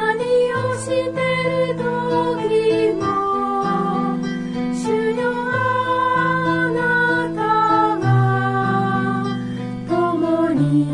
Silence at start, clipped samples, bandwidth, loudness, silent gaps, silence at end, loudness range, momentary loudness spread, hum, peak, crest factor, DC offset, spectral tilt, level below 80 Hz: 0 s; under 0.1%; 11.5 kHz; -19 LUFS; none; 0 s; 2 LU; 6 LU; none; -6 dBFS; 14 dB; under 0.1%; -7 dB/octave; -50 dBFS